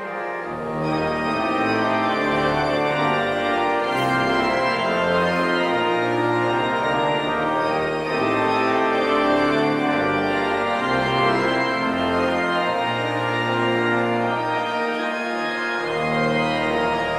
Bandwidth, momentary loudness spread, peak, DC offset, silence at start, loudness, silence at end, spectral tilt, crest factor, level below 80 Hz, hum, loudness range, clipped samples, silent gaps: 14 kHz; 4 LU; -6 dBFS; under 0.1%; 0 s; -21 LUFS; 0 s; -5.5 dB/octave; 14 dB; -50 dBFS; none; 2 LU; under 0.1%; none